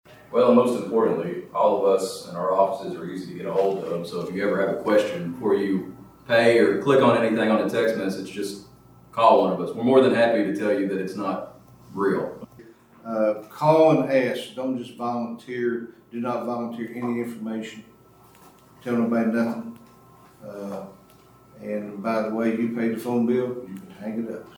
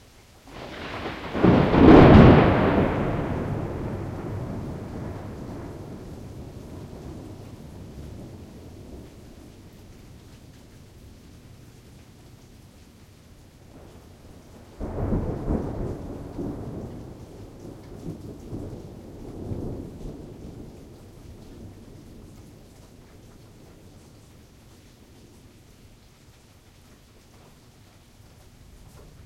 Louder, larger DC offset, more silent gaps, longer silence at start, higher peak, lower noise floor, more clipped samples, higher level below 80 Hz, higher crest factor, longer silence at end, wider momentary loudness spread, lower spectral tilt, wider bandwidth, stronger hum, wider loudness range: about the same, -23 LUFS vs -21 LUFS; neither; neither; second, 0.1 s vs 0.5 s; about the same, -4 dBFS vs -2 dBFS; about the same, -52 dBFS vs -53 dBFS; neither; second, -66 dBFS vs -38 dBFS; about the same, 20 dB vs 24 dB; second, 0.05 s vs 7.55 s; second, 16 LU vs 27 LU; second, -6.5 dB/octave vs -8.5 dB/octave; first, 19 kHz vs 14.5 kHz; neither; second, 8 LU vs 28 LU